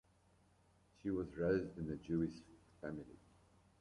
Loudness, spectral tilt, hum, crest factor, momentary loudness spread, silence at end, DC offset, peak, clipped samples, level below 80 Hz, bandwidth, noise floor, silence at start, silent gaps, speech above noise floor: -42 LUFS; -8.5 dB/octave; none; 20 dB; 14 LU; 0.6 s; under 0.1%; -24 dBFS; under 0.1%; -64 dBFS; 11 kHz; -72 dBFS; 1.05 s; none; 31 dB